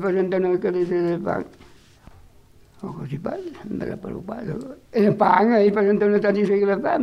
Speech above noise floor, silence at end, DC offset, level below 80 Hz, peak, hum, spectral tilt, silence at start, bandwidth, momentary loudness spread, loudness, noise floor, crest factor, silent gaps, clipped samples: 30 dB; 0 s; under 0.1%; -56 dBFS; -2 dBFS; none; -8.5 dB/octave; 0 s; 7 kHz; 16 LU; -21 LUFS; -51 dBFS; 18 dB; none; under 0.1%